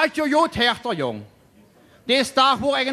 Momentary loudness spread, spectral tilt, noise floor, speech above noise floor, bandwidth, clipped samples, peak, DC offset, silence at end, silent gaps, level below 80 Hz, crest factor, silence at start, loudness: 11 LU; -3.5 dB/octave; -53 dBFS; 33 dB; 15 kHz; under 0.1%; -4 dBFS; under 0.1%; 0 s; none; -54 dBFS; 18 dB; 0 s; -20 LUFS